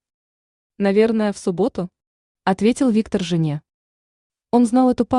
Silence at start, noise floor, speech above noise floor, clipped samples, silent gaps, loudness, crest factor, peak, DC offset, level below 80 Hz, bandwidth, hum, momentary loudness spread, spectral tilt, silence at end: 0.8 s; under -90 dBFS; over 72 dB; under 0.1%; 2.07-2.35 s, 3.74-4.30 s; -19 LUFS; 16 dB; -4 dBFS; under 0.1%; -54 dBFS; 11 kHz; none; 9 LU; -6.5 dB/octave; 0 s